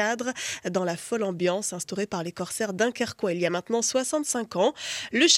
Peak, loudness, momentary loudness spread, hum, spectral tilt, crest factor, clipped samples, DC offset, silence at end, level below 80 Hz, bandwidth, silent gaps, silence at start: -6 dBFS; -27 LUFS; 6 LU; none; -2.5 dB/octave; 20 dB; under 0.1%; under 0.1%; 0 s; -70 dBFS; 16.5 kHz; none; 0 s